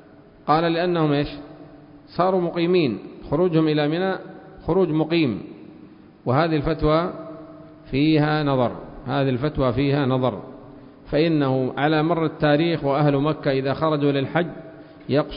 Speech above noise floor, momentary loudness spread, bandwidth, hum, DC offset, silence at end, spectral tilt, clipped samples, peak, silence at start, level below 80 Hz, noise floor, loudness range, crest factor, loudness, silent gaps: 25 dB; 16 LU; 5.4 kHz; none; under 0.1%; 0 s; -12 dB/octave; under 0.1%; -4 dBFS; 0.45 s; -44 dBFS; -46 dBFS; 2 LU; 18 dB; -21 LUFS; none